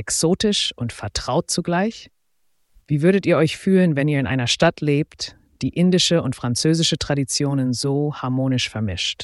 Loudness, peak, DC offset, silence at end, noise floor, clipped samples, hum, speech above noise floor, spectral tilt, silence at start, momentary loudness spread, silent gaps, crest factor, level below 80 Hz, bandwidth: -20 LUFS; -4 dBFS; under 0.1%; 0 s; -71 dBFS; under 0.1%; none; 52 dB; -4.5 dB/octave; 0 s; 9 LU; none; 16 dB; -48 dBFS; 12 kHz